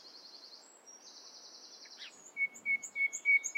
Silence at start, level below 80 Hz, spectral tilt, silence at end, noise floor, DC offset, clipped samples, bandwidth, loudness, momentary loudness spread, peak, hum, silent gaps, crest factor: 0.05 s; under -90 dBFS; 2.5 dB/octave; 0.05 s; -57 dBFS; under 0.1%; under 0.1%; 16 kHz; -32 LUFS; 23 LU; -20 dBFS; none; none; 18 dB